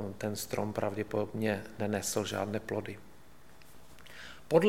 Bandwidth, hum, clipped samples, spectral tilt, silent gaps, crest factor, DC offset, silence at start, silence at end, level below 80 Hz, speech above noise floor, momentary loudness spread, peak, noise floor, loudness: 17 kHz; none; under 0.1%; -5 dB/octave; none; 24 dB; 0.3%; 0 s; 0 s; -62 dBFS; 23 dB; 17 LU; -10 dBFS; -58 dBFS; -35 LUFS